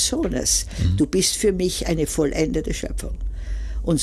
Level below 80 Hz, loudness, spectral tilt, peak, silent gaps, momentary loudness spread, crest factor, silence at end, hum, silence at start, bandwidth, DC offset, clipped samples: -30 dBFS; -22 LUFS; -4 dB/octave; -8 dBFS; none; 12 LU; 14 dB; 0 s; none; 0 s; 15.5 kHz; under 0.1%; under 0.1%